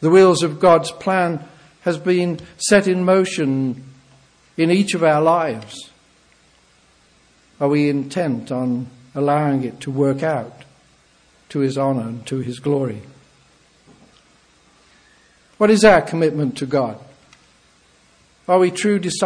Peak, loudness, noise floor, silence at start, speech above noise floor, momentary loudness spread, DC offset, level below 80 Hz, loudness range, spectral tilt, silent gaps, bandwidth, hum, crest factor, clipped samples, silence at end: 0 dBFS; -18 LUFS; -55 dBFS; 0 s; 38 dB; 13 LU; under 0.1%; -54 dBFS; 7 LU; -5.5 dB/octave; none; 10.5 kHz; none; 20 dB; under 0.1%; 0 s